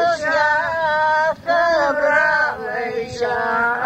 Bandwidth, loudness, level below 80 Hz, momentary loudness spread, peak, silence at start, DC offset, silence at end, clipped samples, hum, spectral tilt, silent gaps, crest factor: 10.5 kHz; -18 LUFS; -52 dBFS; 8 LU; -4 dBFS; 0 s; under 0.1%; 0 s; under 0.1%; none; -3.5 dB/octave; none; 14 dB